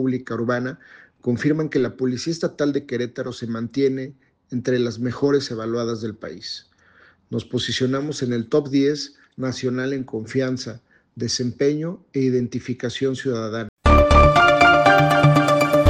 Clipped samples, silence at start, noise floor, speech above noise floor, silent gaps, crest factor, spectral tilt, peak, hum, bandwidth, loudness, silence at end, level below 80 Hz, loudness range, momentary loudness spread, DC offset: under 0.1%; 0 s; -54 dBFS; 31 dB; 13.69-13.77 s; 20 dB; -6 dB/octave; 0 dBFS; none; 15.5 kHz; -20 LUFS; 0 s; -32 dBFS; 9 LU; 17 LU; under 0.1%